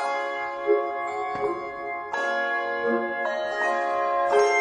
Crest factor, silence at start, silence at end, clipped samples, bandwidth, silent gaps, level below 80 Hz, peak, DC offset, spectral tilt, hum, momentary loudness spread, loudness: 16 dB; 0 s; 0 s; under 0.1%; 10 kHz; none; -66 dBFS; -8 dBFS; under 0.1%; -3 dB/octave; none; 7 LU; -26 LUFS